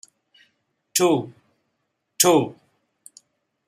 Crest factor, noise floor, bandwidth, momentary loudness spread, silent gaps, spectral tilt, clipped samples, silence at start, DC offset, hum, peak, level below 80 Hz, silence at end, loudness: 26 dB; -75 dBFS; 15 kHz; 14 LU; none; -3.5 dB/octave; under 0.1%; 0.95 s; under 0.1%; none; 0 dBFS; -70 dBFS; 1.15 s; -20 LUFS